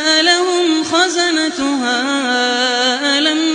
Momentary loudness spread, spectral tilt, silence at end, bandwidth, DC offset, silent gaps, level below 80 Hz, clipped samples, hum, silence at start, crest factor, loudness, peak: 5 LU; -0.5 dB/octave; 0 s; 10 kHz; under 0.1%; none; -60 dBFS; under 0.1%; none; 0 s; 14 dB; -14 LUFS; -2 dBFS